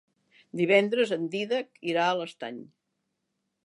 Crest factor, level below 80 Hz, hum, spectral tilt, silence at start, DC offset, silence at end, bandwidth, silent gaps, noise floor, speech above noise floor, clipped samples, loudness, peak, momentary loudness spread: 22 dB; -84 dBFS; none; -5.5 dB/octave; 0.55 s; under 0.1%; 1 s; 11.5 kHz; none; -80 dBFS; 53 dB; under 0.1%; -27 LUFS; -6 dBFS; 17 LU